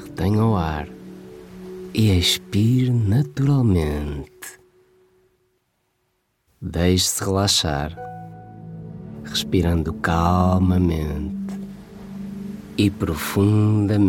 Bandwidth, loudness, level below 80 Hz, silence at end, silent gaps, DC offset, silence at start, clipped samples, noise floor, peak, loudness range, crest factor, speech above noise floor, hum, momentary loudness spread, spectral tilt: 17.5 kHz; -20 LUFS; -38 dBFS; 0 s; none; under 0.1%; 0 s; under 0.1%; -70 dBFS; -4 dBFS; 5 LU; 16 dB; 51 dB; none; 20 LU; -5.5 dB/octave